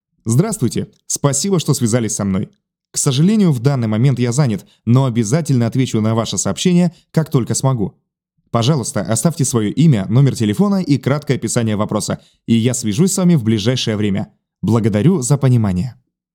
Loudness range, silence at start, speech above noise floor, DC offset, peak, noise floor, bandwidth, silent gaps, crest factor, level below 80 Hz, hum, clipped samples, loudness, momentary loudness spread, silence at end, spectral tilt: 2 LU; 0.25 s; 35 dB; under 0.1%; 0 dBFS; -50 dBFS; 17.5 kHz; none; 16 dB; -54 dBFS; none; under 0.1%; -16 LUFS; 8 LU; 0.4 s; -5.5 dB/octave